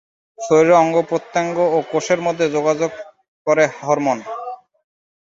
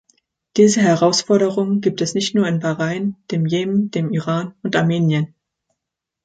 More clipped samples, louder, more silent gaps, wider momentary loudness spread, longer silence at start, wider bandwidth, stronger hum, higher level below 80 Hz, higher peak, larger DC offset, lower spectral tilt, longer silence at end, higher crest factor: neither; about the same, -17 LUFS vs -18 LUFS; first, 3.28-3.45 s vs none; first, 17 LU vs 9 LU; second, 0.4 s vs 0.55 s; second, 7.8 kHz vs 9.2 kHz; neither; about the same, -64 dBFS vs -62 dBFS; about the same, -2 dBFS vs -2 dBFS; neither; about the same, -5 dB/octave vs -5.5 dB/octave; second, 0.85 s vs 1 s; about the same, 16 dB vs 16 dB